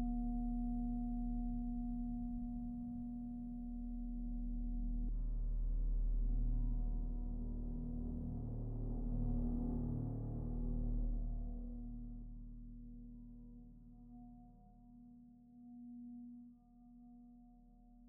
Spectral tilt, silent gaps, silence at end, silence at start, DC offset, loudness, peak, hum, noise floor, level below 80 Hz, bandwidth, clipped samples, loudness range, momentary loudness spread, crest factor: -12.5 dB/octave; none; 0 s; 0 s; under 0.1%; -44 LUFS; -28 dBFS; none; -63 dBFS; -42 dBFS; 1.3 kHz; under 0.1%; 15 LU; 19 LU; 12 dB